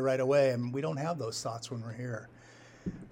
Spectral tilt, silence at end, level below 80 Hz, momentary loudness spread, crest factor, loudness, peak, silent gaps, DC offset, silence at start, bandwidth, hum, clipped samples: -5.5 dB/octave; 0 s; -62 dBFS; 16 LU; 16 dB; -33 LUFS; -16 dBFS; none; under 0.1%; 0 s; 16.5 kHz; none; under 0.1%